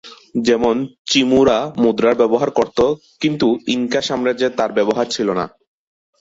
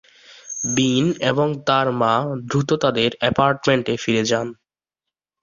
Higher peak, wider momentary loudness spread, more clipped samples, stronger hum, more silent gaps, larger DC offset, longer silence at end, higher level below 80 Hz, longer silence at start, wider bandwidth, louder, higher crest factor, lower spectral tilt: about the same, -2 dBFS vs -2 dBFS; about the same, 7 LU vs 5 LU; neither; neither; first, 0.98-1.05 s vs none; neither; second, 0.75 s vs 0.9 s; about the same, -50 dBFS vs -54 dBFS; second, 0.05 s vs 0.3 s; about the same, 8 kHz vs 7.4 kHz; about the same, -17 LUFS vs -19 LUFS; about the same, 14 dB vs 18 dB; about the same, -4.5 dB/octave vs -4.5 dB/octave